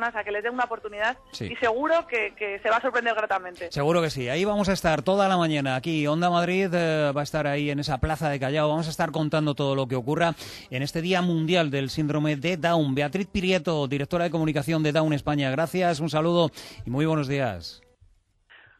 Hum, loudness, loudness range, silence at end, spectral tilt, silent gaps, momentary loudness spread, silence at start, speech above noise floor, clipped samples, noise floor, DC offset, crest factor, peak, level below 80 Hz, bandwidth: none; -25 LUFS; 2 LU; 1.05 s; -6 dB/octave; none; 6 LU; 0 s; 35 dB; under 0.1%; -60 dBFS; under 0.1%; 16 dB; -8 dBFS; -50 dBFS; 13.5 kHz